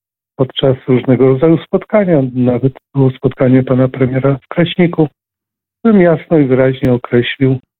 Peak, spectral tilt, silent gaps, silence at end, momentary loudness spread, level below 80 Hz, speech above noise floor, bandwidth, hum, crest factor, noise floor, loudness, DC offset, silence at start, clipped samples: 0 dBFS; -10.5 dB/octave; none; 0.2 s; 6 LU; -44 dBFS; 72 dB; 4.1 kHz; none; 12 dB; -83 dBFS; -12 LUFS; under 0.1%; 0.4 s; under 0.1%